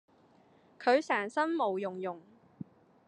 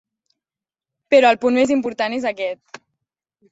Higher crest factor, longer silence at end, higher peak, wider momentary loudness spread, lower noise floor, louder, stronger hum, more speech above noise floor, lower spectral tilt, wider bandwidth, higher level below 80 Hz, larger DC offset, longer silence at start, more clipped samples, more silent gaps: about the same, 20 dB vs 18 dB; second, 0.45 s vs 0.95 s; second, -14 dBFS vs -2 dBFS; first, 22 LU vs 13 LU; second, -64 dBFS vs under -90 dBFS; second, -32 LUFS vs -18 LUFS; neither; second, 33 dB vs over 73 dB; about the same, -5 dB/octave vs -4 dB/octave; first, 10.5 kHz vs 8 kHz; second, -88 dBFS vs -64 dBFS; neither; second, 0.8 s vs 1.1 s; neither; neither